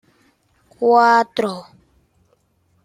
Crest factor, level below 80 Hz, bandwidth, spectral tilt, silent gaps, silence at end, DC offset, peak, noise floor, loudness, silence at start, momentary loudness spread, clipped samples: 18 dB; -66 dBFS; 14 kHz; -4.5 dB/octave; none; 1.2 s; under 0.1%; -2 dBFS; -62 dBFS; -16 LUFS; 0.8 s; 13 LU; under 0.1%